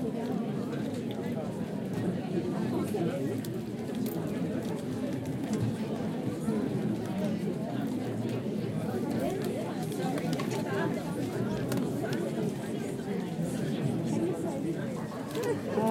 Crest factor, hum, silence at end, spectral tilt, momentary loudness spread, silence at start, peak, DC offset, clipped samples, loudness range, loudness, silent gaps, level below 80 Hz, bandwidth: 16 dB; none; 0 s; -7 dB/octave; 3 LU; 0 s; -16 dBFS; under 0.1%; under 0.1%; 1 LU; -33 LUFS; none; -62 dBFS; 16.5 kHz